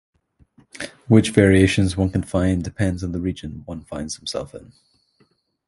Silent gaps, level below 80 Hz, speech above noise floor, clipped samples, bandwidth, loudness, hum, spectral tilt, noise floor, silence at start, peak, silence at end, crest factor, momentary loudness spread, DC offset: none; -38 dBFS; 43 dB; under 0.1%; 11.5 kHz; -20 LUFS; none; -6 dB/octave; -63 dBFS; 0.75 s; 0 dBFS; 1.1 s; 20 dB; 19 LU; under 0.1%